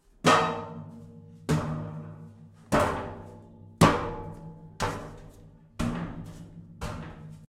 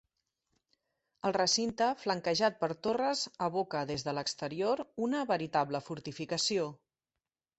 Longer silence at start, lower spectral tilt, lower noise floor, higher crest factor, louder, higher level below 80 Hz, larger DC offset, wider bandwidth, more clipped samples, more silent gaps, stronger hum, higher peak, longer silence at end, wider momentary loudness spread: second, 0.25 s vs 1.25 s; first, -5.5 dB/octave vs -3.5 dB/octave; second, -52 dBFS vs under -90 dBFS; first, 26 dB vs 18 dB; first, -28 LUFS vs -33 LUFS; first, -48 dBFS vs -70 dBFS; neither; first, 16 kHz vs 8.2 kHz; neither; neither; neither; first, -6 dBFS vs -16 dBFS; second, 0.1 s vs 0.85 s; first, 25 LU vs 7 LU